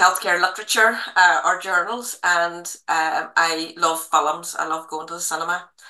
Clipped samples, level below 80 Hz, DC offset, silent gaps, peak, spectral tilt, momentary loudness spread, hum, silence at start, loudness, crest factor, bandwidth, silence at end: under 0.1%; -80 dBFS; under 0.1%; none; -2 dBFS; -0.5 dB/octave; 10 LU; none; 0 s; -20 LUFS; 20 dB; 13 kHz; 0 s